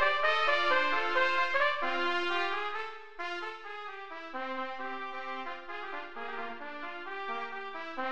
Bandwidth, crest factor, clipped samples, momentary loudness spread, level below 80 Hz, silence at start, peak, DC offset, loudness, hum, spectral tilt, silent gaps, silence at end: 9.4 kHz; 20 dB; under 0.1%; 14 LU; -68 dBFS; 0 s; -14 dBFS; 0.5%; -32 LUFS; none; -2.5 dB/octave; none; 0 s